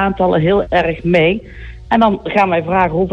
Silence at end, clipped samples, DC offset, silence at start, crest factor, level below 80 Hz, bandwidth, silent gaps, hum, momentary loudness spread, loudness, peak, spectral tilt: 0 s; under 0.1%; under 0.1%; 0 s; 12 dB; -34 dBFS; 7.8 kHz; none; none; 6 LU; -14 LUFS; -2 dBFS; -8 dB/octave